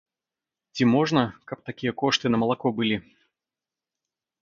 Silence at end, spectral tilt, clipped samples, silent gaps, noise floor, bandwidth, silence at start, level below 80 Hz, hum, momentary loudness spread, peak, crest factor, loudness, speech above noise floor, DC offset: 1.4 s; -5.5 dB/octave; under 0.1%; none; -90 dBFS; 7.4 kHz; 0.75 s; -62 dBFS; none; 13 LU; -6 dBFS; 22 dB; -24 LUFS; 66 dB; under 0.1%